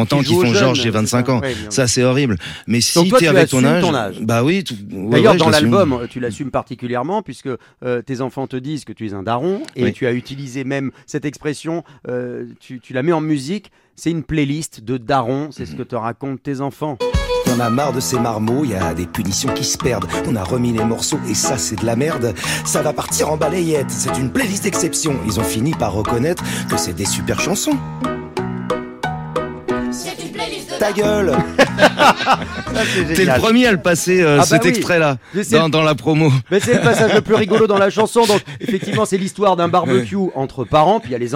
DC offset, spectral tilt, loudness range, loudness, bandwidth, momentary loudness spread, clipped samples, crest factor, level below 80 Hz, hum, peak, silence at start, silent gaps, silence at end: under 0.1%; -4.5 dB/octave; 8 LU; -17 LUFS; 16.5 kHz; 12 LU; under 0.1%; 16 dB; -42 dBFS; none; 0 dBFS; 0 s; none; 0 s